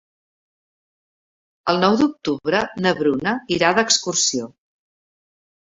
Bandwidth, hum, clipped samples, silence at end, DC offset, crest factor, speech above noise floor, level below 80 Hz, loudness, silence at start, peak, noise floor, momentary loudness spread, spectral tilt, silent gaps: 8 kHz; none; under 0.1%; 1.3 s; under 0.1%; 22 dB; over 71 dB; -58 dBFS; -19 LUFS; 1.65 s; 0 dBFS; under -90 dBFS; 8 LU; -3 dB/octave; none